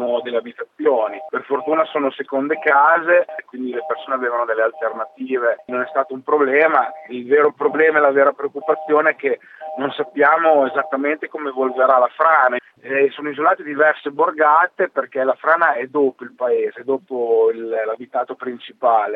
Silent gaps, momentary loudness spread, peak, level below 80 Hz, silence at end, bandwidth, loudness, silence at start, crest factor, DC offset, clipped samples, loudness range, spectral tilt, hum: none; 11 LU; 0 dBFS; -84 dBFS; 0 s; 4.1 kHz; -18 LUFS; 0 s; 18 dB; under 0.1%; under 0.1%; 3 LU; -7 dB/octave; none